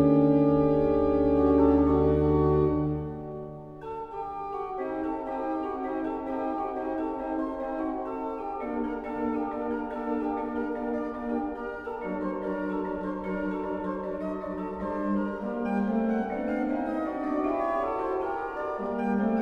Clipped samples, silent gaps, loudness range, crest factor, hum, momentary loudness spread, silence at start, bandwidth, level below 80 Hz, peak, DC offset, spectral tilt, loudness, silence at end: under 0.1%; none; 8 LU; 18 dB; none; 11 LU; 0 s; 5 kHz; -44 dBFS; -8 dBFS; under 0.1%; -10 dB/octave; -29 LUFS; 0 s